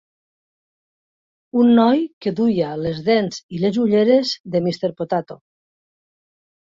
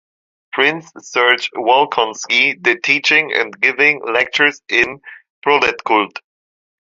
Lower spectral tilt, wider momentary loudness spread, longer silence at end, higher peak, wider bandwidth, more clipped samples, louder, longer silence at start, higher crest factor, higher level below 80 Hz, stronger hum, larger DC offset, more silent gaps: first, -6.5 dB/octave vs -2 dB/octave; about the same, 10 LU vs 10 LU; first, 1.3 s vs 0.75 s; about the same, -2 dBFS vs 0 dBFS; about the same, 7.6 kHz vs 7.8 kHz; neither; second, -19 LUFS vs -14 LUFS; first, 1.55 s vs 0.55 s; about the same, 18 dB vs 16 dB; about the same, -58 dBFS vs -60 dBFS; neither; neither; first, 2.13-2.21 s, 3.43-3.49 s, 4.40-4.44 s vs 5.30-5.42 s